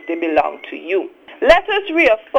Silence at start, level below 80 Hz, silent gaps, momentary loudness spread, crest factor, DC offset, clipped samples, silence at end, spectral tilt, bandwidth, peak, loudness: 0.05 s; -42 dBFS; none; 11 LU; 16 dB; under 0.1%; under 0.1%; 0 s; -4 dB/octave; 10 kHz; 0 dBFS; -16 LUFS